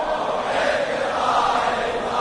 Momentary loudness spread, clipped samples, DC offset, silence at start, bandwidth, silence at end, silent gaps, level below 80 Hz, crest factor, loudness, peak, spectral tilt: 4 LU; under 0.1%; under 0.1%; 0 s; 11 kHz; 0 s; none; -48 dBFS; 14 dB; -21 LUFS; -6 dBFS; -3 dB/octave